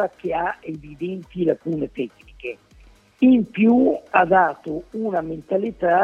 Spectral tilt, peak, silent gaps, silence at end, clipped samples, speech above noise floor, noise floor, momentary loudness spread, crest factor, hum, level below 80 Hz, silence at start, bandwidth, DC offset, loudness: -8.5 dB/octave; -2 dBFS; none; 0 s; under 0.1%; 30 dB; -51 dBFS; 17 LU; 20 dB; none; -52 dBFS; 0 s; 4.9 kHz; under 0.1%; -21 LUFS